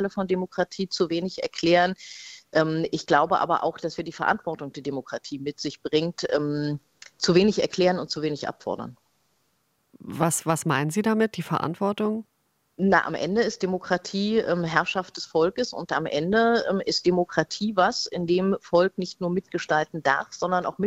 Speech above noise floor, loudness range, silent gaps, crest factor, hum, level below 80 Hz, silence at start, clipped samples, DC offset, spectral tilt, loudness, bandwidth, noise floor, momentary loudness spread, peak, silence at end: 46 dB; 4 LU; none; 22 dB; none; -60 dBFS; 0 s; under 0.1%; under 0.1%; -5 dB/octave; -25 LUFS; 15.5 kHz; -71 dBFS; 11 LU; -4 dBFS; 0 s